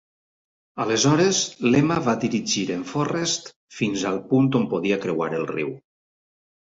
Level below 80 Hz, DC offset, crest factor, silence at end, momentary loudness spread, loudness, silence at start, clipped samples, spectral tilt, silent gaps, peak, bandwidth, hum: -60 dBFS; under 0.1%; 16 dB; 0.85 s; 10 LU; -22 LUFS; 0.75 s; under 0.1%; -4.5 dB/octave; 3.56-3.68 s; -6 dBFS; 8 kHz; none